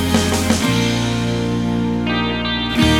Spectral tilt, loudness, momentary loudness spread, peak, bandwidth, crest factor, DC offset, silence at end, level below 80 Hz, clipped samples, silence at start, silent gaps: -4.5 dB/octave; -18 LUFS; 3 LU; 0 dBFS; 17 kHz; 16 dB; under 0.1%; 0 s; -32 dBFS; under 0.1%; 0 s; none